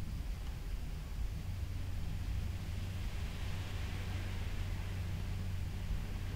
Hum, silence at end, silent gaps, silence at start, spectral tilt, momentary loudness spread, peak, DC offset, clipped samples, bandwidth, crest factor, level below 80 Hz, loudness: none; 0 s; none; 0 s; -5.5 dB/octave; 3 LU; -28 dBFS; under 0.1%; under 0.1%; 16 kHz; 12 dB; -42 dBFS; -42 LUFS